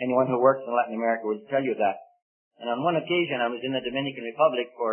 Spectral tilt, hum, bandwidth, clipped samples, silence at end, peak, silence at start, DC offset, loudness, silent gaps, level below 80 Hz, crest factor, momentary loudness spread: -10 dB/octave; none; 3.4 kHz; under 0.1%; 0 s; -8 dBFS; 0 s; under 0.1%; -26 LUFS; 2.22-2.51 s; -72 dBFS; 18 dB; 8 LU